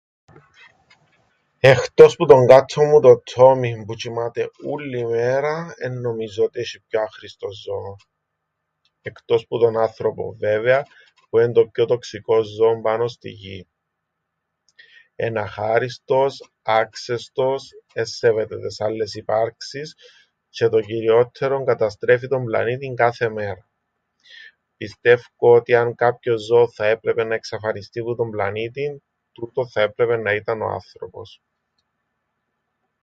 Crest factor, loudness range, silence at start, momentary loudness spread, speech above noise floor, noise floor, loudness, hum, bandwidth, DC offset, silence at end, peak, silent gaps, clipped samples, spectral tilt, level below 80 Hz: 20 dB; 11 LU; 1.65 s; 18 LU; 59 dB; -77 dBFS; -19 LUFS; none; 7.8 kHz; under 0.1%; 1.75 s; 0 dBFS; none; under 0.1%; -6 dB/octave; -58 dBFS